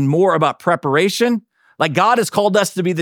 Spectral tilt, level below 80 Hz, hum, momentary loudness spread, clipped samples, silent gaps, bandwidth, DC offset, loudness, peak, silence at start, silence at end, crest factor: -5 dB/octave; -70 dBFS; none; 5 LU; under 0.1%; none; 19 kHz; under 0.1%; -16 LUFS; -2 dBFS; 0 s; 0 s; 14 dB